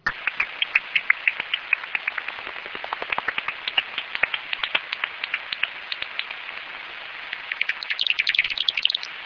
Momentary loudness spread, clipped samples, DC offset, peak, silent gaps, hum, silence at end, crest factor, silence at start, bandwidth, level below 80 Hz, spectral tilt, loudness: 12 LU; under 0.1%; under 0.1%; -2 dBFS; none; none; 0 s; 26 dB; 0.05 s; 5.4 kHz; -62 dBFS; -1 dB/octave; -24 LUFS